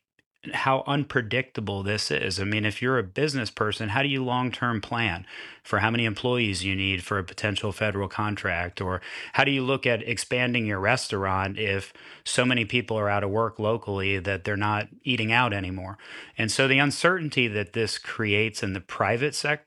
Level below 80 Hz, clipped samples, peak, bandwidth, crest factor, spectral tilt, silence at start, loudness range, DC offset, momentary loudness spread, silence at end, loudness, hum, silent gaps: -58 dBFS; under 0.1%; -4 dBFS; 13 kHz; 22 dB; -4.5 dB/octave; 0.45 s; 2 LU; under 0.1%; 8 LU; 0.1 s; -25 LUFS; none; none